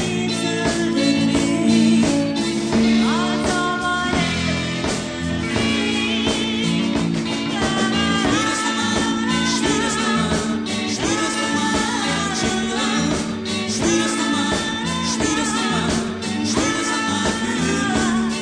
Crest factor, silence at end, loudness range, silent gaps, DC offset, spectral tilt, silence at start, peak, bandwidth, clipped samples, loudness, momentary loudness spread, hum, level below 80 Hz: 14 dB; 0 s; 2 LU; none; under 0.1%; -3.5 dB/octave; 0 s; -6 dBFS; 10 kHz; under 0.1%; -19 LUFS; 5 LU; none; -42 dBFS